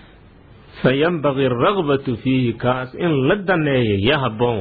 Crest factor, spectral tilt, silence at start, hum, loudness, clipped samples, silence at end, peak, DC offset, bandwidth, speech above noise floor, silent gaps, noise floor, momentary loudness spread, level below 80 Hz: 16 dB; -10 dB/octave; 0.75 s; none; -18 LUFS; under 0.1%; 0 s; -4 dBFS; under 0.1%; 4.9 kHz; 28 dB; none; -45 dBFS; 4 LU; -46 dBFS